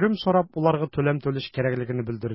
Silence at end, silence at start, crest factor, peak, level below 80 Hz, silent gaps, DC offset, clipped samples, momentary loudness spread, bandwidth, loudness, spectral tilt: 0 s; 0 s; 16 dB; -8 dBFS; -54 dBFS; none; under 0.1%; under 0.1%; 7 LU; 5.8 kHz; -25 LUFS; -11.5 dB/octave